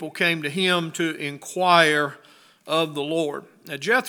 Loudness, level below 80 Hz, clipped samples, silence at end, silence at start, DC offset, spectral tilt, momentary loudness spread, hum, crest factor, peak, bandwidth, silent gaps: -22 LUFS; -80 dBFS; under 0.1%; 0 s; 0 s; under 0.1%; -4 dB/octave; 14 LU; none; 22 dB; 0 dBFS; over 20 kHz; none